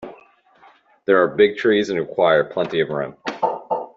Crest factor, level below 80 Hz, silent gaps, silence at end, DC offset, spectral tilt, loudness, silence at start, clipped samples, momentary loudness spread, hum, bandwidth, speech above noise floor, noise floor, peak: 18 dB; -62 dBFS; none; 0.1 s; under 0.1%; -6 dB/octave; -19 LUFS; 0 s; under 0.1%; 10 LU; none; 7.4 kHz; 34 dB; -52 dBFS; -2 dBFS